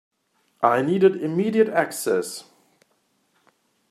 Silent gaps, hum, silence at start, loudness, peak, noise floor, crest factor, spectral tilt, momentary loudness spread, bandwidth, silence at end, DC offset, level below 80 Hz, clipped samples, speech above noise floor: none; none; 0.6 s; -21 LUFS; -4 dBFS; -68 dBFS; 20 dB; -5.5 dB/octave; 7 LU; 15 kHz; 1.5 s; under 0.1%; -74 dBFS; under 0.1%; 47 dB